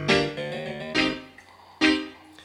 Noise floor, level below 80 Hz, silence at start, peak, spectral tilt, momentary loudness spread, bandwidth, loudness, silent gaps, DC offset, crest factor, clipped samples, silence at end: -50 dBFS; -54 dBFS; 0 s; -6 dBFS; -4.5 dB/octave; 12 LU; 11.5 kHz; -25 LUFS; none; under 0.1%; 20 dB; under 0.1%; 0 s